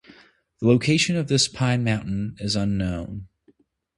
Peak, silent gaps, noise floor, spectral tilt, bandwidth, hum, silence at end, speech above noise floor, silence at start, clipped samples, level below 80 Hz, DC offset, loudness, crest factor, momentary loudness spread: -4 dBFS; none; -61 dBFS; -5 dB/octave; 11.5 kHz; none; 0.7 s; 39 dB; 0.6 s; under 0.1%; -46 dBFS; under 0.1%; -22 LUFS; 20 dB; 11 LU